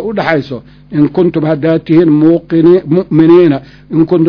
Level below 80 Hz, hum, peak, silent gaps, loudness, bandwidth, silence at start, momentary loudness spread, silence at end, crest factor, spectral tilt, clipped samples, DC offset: -44 dBFS; none; 0 dBFS; none; -10 LUFS; 5.4 kHz; 0 s; 11 LU; 0 s; 10 dB; -10 dB/octave; 2%; under 0.1%